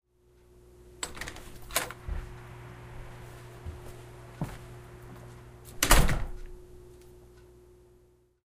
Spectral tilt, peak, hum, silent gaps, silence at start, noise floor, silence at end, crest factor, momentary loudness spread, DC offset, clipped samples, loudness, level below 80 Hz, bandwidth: -3 dB/octave; -2 dBFS; 60 Hz at -50 dBFS; none; 0.85 s; -63 dBFS; 1.2 s; 30 dB; 26 LU; under 0.1%; under 0.1%; -31 LUFS; -36 dBFS; 15.5 kHz